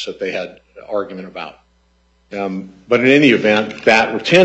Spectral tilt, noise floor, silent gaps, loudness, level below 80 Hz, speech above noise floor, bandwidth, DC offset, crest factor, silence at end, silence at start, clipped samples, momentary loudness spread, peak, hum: -5 dB/octave; -57 dBFS; none; -15 LUFS; -56 dBFS; 42 dB; 8.4 kHz; under 0.1%; 16 dB; 0 s; 0 s; under 0.1%; 20 LU; 0 dBFS; none